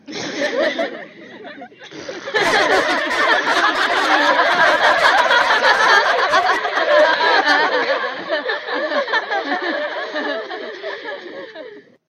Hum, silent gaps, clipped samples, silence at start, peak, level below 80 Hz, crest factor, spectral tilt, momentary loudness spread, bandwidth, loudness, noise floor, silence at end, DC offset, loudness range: none; none; under 0.1%; 0.1 s; 0 dBFS; -60 dBFS; 16 dB; -1.5 dB/octave; 20 LU; 15.5 kHz; -16 LUFS; -38 dBFS; 0.3 s; under 0.1%; 8 LU